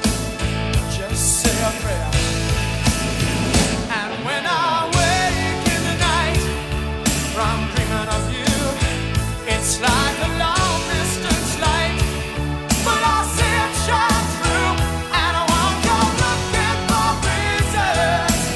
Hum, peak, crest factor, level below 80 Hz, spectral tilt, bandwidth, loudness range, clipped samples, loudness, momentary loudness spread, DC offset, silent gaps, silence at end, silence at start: none; -4 dBFS; 16 dB; -28 dBFS; -3.5 dB/octave; 12 kHz; 2 LU; under 0.1%; -19 LUFS; 5 LU; under 0.1%; none; 0 s; 0 s